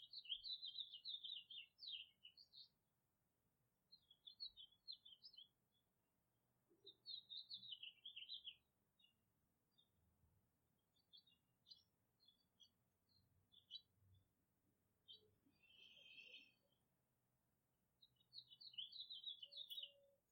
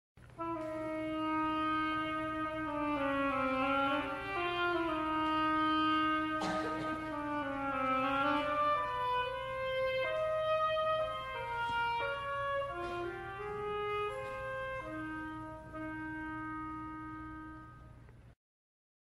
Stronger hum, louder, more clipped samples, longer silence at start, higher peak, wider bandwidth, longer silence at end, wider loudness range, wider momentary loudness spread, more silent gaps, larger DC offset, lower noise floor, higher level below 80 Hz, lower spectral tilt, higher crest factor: neither; second, -56 LUFS vs -35 LUFS; neither; second, 0 s vs 0.15 s; second, -36 dBFS vs -20 dBFS; first, 16.5 kHz vs 13.5 kHz; second, 0.15 s vs 0.75 s; about the same, 11 LU vs 9 LU; first, 15 LU vs 11 LU; neither; neither; first, -89 dBFS vs -56 dBFS; second, under -90 dBFS vs -58 dBFS; second, -1 dB/octave vs -5.5 dB/octave; first, 26 dB vs 16 dB